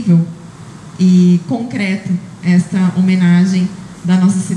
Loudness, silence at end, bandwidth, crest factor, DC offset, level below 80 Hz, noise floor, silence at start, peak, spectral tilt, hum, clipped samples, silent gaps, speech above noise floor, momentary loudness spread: -13 LUFS; 0 s; 10.5 kHz; 12 dB; under 0.1%; -54 dBFS; -33 dBFS; 0 s; -2 dBFS; -7 dB/octave; none; under 0.1%; none; 21 dB; 14 LU